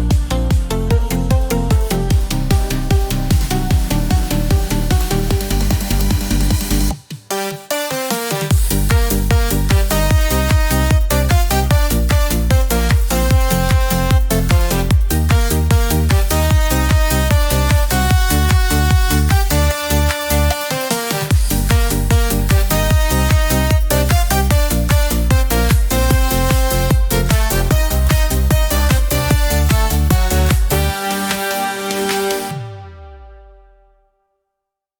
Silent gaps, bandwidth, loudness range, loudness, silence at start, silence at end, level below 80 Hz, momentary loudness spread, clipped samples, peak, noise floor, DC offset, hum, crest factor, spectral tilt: none; over 20 kHz; 3 LU; -16 LUFS; 0 s; 1.65 s; -18 dBFS; 4 LU; under 0.1%; 0 dBFS; -79 dBFS; under 0.1%; none; 14 dB; -5 dB/octave